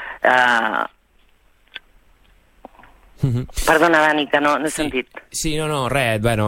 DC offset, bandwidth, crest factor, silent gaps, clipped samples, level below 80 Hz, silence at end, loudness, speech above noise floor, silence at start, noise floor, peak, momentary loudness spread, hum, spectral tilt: under 0.1%; 16.5 kHz; 18 dB; none; under 0.1%; -38 dBFS; 0 s; -18 LUFS; 38 dB; 0 s; -56 dBFS; -2 dBFS; 15 LU; none; -4.5 dB/octave